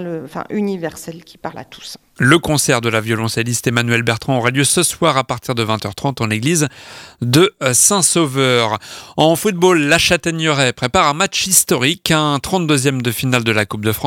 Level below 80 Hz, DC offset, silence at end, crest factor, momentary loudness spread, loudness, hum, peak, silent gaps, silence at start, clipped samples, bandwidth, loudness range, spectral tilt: -46 dBFS; under 0.1%; 0 s; 16 dB; 15 LU; -15 LUFS; none; 0 dBFS; none; 0 s; under 0.1%; 18 kHz; 3 LU; -3.5 dB/octave